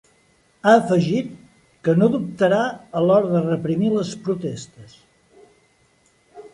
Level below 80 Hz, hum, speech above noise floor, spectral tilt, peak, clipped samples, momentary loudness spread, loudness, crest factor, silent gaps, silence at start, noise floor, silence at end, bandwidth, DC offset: -62 dBFS; none; 41 dB; -7 dB/octave; -2 dBFS; under 0.1%; 11 LU; -20 LUFS; 18 dB; none; 0.65 s; -60 dBFS; 0.05 s; 11.5 kHz; under 0.1%